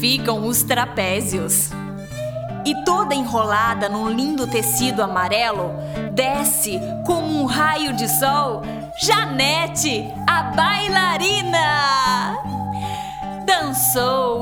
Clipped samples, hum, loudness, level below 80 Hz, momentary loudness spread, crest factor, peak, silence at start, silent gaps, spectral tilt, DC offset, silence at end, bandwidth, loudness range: under 0.1%; none; -19 LUFS; -46 dBFS; 9 LU; 18 dB; -2 dBFS; 0 s; none; -3 dB/octave; under 0.1%; 0 s; over 20 kHz; 3 LU